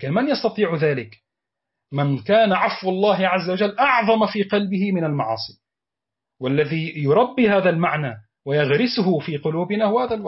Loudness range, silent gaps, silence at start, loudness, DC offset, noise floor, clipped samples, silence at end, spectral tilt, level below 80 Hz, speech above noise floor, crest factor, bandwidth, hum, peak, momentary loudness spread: 3 LU; none; 0 s; -20 LUFS; under 0.1%; -87 dBFS; under 0.1%; 0 s; -9.5 dB/octave; -62 dBFS; 67 dB; 14 dB; 6 kHz; none; -6 dBFS; 9 LU